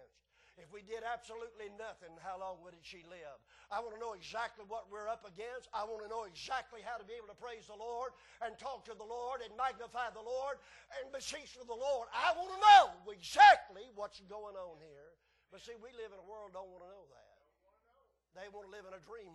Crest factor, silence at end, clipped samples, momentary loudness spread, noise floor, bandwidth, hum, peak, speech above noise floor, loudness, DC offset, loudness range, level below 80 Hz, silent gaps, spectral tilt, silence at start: 24 dB; 0.05 s; under 0.1%; 22 LU; -75 dBFS; 12 kHz; none; -12 dBFS; 39 dB; -33 LUFS; under 0.1%; 25 LU; -72 dBFS; none; -1 dB/octave; 0.75 s